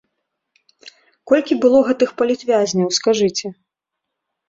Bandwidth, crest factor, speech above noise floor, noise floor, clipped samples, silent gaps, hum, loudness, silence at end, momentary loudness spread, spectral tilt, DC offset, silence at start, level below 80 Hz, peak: 8 kHz; 18 dB; 64 dB; -81 dBFS; under 0.1%; none; none; -17 LUFS; 0.95 s; 6 LU; -4.5 dB/octave; under 0.1%; 0.85 s; -62 dBFS; -2 dBFS